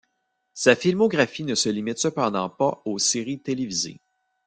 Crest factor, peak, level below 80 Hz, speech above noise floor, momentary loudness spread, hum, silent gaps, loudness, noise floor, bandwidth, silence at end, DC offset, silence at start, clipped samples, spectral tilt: 22 dB; -2 dBFS; -66 dBFS; 52 dB; 8 LU; none; none; -23 LUFS; -75 dBFS; 10 kHz; 0.5 s; under 0.1%; 0.55 s; under 0.1%; -3.5 dB/octave